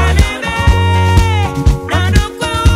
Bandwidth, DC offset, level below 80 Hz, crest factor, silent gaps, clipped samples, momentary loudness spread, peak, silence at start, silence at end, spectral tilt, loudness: 15 kHz; under 0.1%; -16 dBFS; 10 dB; none; under 0.1%; 4 LU; 0 dBFS; 0 s; 0 s; -5.5 dB/octave; -13 LUFS